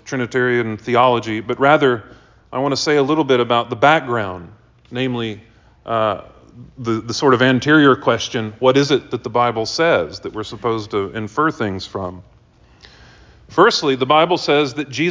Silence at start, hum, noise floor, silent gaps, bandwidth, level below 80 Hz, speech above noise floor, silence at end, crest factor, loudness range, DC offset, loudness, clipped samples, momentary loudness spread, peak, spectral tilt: 0.05 s; none; -50 dBFS; none; 7.6 kHz; -50 dBFS; 33 dB; 0 s; 16 dB; 7 LU; under 0.1%; -17 LUFS; under 0.1%; 13 LU; 0 dBFS; -5 dB/octave